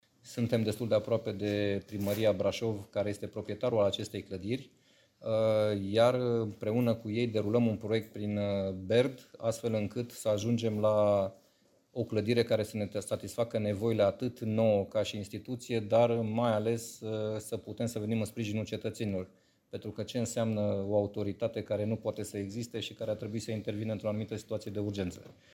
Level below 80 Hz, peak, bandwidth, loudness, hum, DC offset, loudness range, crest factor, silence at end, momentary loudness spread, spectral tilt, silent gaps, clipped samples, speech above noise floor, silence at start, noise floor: -68 dBFS; -14 dBFS; 17 kHz; -32 LUFS; none; under 0.1%; 5 LU; 20 dB; 0.2 s; 10 LU; -6.5 dB/octave; none; under 0.1%; 36 dB; 0.25 s; -68 dBFS